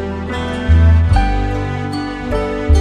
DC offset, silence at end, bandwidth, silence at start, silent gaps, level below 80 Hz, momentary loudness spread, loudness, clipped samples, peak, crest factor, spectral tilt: under 0.1%; 0 s; 9.4 kHz; 0 s; none; -18 dBFS; 11 LU; -16 LUFS; under 0.1%; -2 dBFS; 12 dB; -7.5 dB/octave